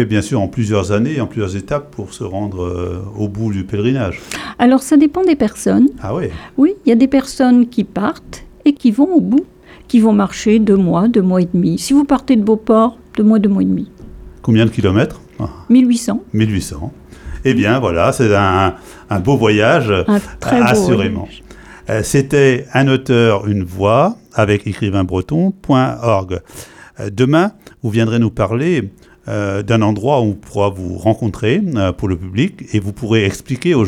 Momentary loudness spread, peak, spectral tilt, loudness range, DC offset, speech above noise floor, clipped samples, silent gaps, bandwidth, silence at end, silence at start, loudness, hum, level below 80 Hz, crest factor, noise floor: 11 LU; 0 dBFS; -6.5 dB/octave; 4 LU; under 0.1%; 20 dB; under 0.1%; none; 15 kHz; 0 s; 0 s; -14 LUFS; none; -40 dBFS; 14 dB; -34 dBFS